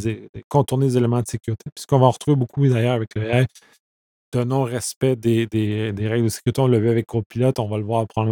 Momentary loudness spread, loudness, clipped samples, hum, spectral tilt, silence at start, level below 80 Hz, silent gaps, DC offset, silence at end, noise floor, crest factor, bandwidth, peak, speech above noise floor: 9 LU; -21 LUFS; under 0.1%; none; -7 dB/octave; 0 s; -52 dBFS; 0.29-0.34 s, 0.44-0.51 s, 1.72-1.76 s, 3.80-4.32 s, 4.96-5.01 s, 7.26-7.30 s; under 0.1%; 0 s; under -90 dBFS; 20 dB; 18 kHz; 0 dBFS; over 70 dB